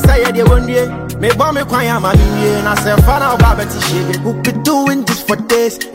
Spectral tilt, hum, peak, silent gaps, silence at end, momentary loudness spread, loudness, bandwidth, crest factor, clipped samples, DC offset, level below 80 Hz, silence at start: -5.5 dB/octave; none; 0 dBFS; none; 0 s; 5 LU; -13 LUFS; 16.5 kHz; 12 dB; under 0.1%; under 0.1%; -18 dBFS; 0 s